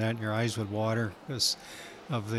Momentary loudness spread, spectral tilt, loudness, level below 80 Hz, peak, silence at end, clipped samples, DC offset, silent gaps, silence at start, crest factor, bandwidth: 9 LU; -4.5 dB/octave; -31 LUFS; -66 dBFS; -14 dBFS; 0 s; under 0.1%; under 0.1%; none; 0 s; 16 dB; 15 kHz